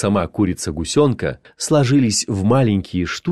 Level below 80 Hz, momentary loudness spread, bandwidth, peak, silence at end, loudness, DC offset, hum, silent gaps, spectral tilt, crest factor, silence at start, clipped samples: -42 dBFS; 9 LU; 13 kHz; -4 dBFS; 0 s; -18 LUFS; under 0.1%; none; none; -5.5 dB/octave; 14 dB; 0 s; under 0.1%